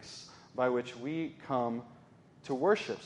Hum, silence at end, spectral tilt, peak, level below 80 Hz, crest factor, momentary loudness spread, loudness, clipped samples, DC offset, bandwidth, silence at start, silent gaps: none; 0 s; -5.5 dB/octave; -16 dBFS; -76 dBFS; 20 dB; 17 LU; -34 LUFS; under 0.1%; under 0.1%; 11 kHz; 0 s; none